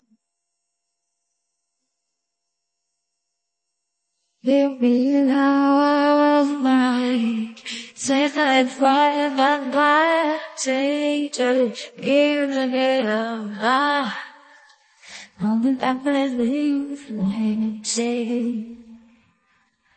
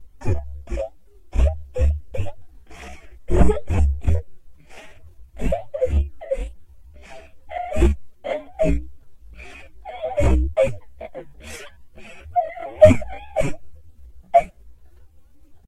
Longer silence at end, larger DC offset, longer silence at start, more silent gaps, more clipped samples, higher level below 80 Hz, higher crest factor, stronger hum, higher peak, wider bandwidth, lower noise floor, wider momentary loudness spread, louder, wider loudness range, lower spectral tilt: about the same, 1 s vs 0.95 s; second, under 0.1% vs 0.5%; first, 4.45 s vs 0 s; neither; neither; second, -68 dBFS vs -28 dBFS; second, 16 dB vs 22 dB; neither; second, -6 dBFS vs 0 dBFS; second, 8.8 kHz vs 11.5 kHz; first, -80 dBFS vs -49 dBFS; second, 11 LU vs 22 LU; about the same, -20 LUFS vs -22 LUFS; about the same, 6 LU vs 6 LU; second, -4 dB/octave vs -7.5 dB/octave